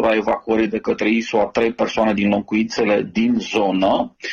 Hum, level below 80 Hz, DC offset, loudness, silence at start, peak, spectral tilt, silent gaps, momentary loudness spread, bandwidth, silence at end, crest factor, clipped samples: none; -50 dBFS; under 0.1%; -19 LUFS; 0 s; -6 dBFS; -5.5 dB/octave; none; 2 LU; 7.2 kHz; 0 s; 12 dB; under 0.1%